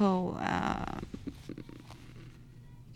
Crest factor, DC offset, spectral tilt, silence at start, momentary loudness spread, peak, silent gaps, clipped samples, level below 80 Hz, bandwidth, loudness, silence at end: 20 dB; under 0.1%; -7 dB/octave; 0 s; 21 LU; -16 dBFS; none; under 0.1%; -52 dBFS; 12 kHz; -35 LUFS; 0 s